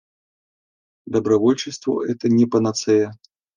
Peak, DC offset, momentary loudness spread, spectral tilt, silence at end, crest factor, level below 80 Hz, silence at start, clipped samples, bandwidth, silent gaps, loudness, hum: -4 dBFS; under 0.1%; 7 LU; -6 dB/octave; 0.45 s; 16 dB; -62 dBFS; 1.05 s; under 0.1%; 10 kHz; none; -20 LUFS; none